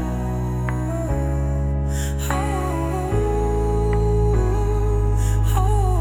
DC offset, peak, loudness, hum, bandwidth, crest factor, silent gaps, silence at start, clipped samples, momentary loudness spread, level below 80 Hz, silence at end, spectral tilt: under 0.1%; -6 dBFS; -22 LUFS; none; 17 kHz; 14 dB; none; 0 s; under 0.1%; 5 LU; -22 dBFS; 0 s; -7 dB/octave